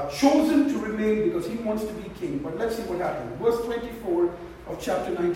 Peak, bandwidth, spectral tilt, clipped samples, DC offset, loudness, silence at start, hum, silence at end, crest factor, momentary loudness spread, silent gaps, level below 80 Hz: -6 dBFS; 16 kHz; -5.5 dB/octave; under 0.1%; under 0.1%; -26 LUFS; 0 s; none; 0 s; 18 dB; 11 LU; none; -50 dBFS